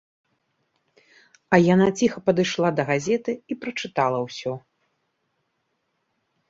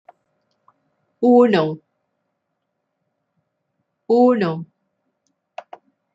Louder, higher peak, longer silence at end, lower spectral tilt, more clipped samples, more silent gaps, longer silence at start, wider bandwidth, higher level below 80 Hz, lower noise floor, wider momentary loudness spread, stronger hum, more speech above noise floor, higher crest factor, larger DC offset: second, -22 LUFS vs -17 LUFS; about the same, -2 dBFS vs -4 dBFS; first, 1.9 s vs 1.5 s; second, -6 dB/octave vs -8 dB/octave; neither; neither; first, 1.5 s vs 1.2 s; about the same, 7.8 kHz vs 7.6 kHz; first, -62 dBFS vs -72 dBFS; about the same, -74 dBFS vs -76 dBFS; second, 12 LU vs 23 LU; neither; second, 53 dB vs 61 dB; first, 24 dB vs 18 dB; neither